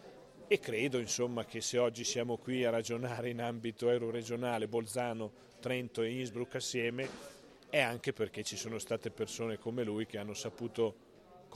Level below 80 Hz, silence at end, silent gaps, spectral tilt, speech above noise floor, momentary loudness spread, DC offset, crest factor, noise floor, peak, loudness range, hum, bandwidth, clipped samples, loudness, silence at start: -74 dBFS; 0 s; none; -4 dB/octave; 21 dB; 8 LU; under 0.1%; 24 dB; -58 dBFS; -14 dBFS; 3 LU; none; 14.5 kHz; under 0.1%; -37 LUFS; 0 s